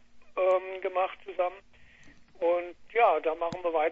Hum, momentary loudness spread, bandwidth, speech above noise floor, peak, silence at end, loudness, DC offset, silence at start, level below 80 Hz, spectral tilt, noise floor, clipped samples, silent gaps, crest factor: none; 8 LU; 7.8 kHz; 25 dB; -12 dBFS; 0 s; -29 LUFS; under 0.1%; 0.15 s; -64 dBFS; -5.5 dB/octave; -53 dBFS; under 0.1%; none; 18 dB